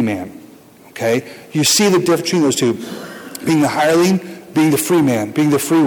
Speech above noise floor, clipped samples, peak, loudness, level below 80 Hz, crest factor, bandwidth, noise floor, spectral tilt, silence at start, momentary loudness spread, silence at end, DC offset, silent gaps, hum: 28 dB; under 0.1%; -6 dBFS; -15 LUFS; -58 dBFS; 10 dB; 19.5 kHz; -43 dBFS; -4.5 dB/octave; 0 s; 13 LU; 0 s; under 0.1%; none; none